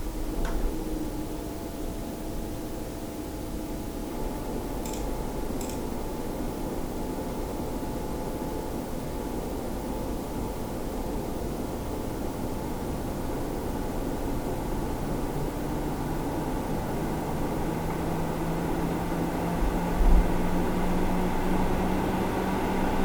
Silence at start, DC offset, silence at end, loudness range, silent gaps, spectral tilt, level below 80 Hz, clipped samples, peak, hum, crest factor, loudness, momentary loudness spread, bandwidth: 0 s; under 0.1%; 0 s; 7 LU; none; -6 dB/octave; -32 dBFS; under 0.1%; -8 dBFS; none; 20 dB; -31 LUFS; 7 LU; over 20 kHz